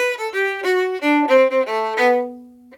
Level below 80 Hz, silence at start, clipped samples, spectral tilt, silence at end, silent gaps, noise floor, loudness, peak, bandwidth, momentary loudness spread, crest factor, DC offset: -70 dBFS; 0 s; under 0.1%; -2.5 dB/octave; 0 s; none; -38 dBFS; -18 LUFS; -4 dBFS; 17 kHz; 6 LU; 16 dB; under 0.1%